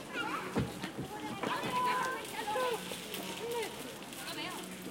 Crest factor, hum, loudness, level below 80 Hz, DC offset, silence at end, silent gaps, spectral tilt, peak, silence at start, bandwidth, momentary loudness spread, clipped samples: 18 dB; none; -37 LUFS; -64 dBFS; under 0.1%; 0 s; none; -3.5 dB/octave; -20 dBFS; 0 s; 17 kHz; 9 LU; under 0.1%